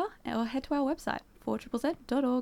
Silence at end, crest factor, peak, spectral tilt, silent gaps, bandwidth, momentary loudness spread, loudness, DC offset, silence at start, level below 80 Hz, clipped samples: 0 s; 16 dB; -16 dBFS; -5.5 dB/octave; none; 16 kHz; 6 LU; -33 LUFS; under 0.1%; 0 s; -58 dBFS; under 0.1%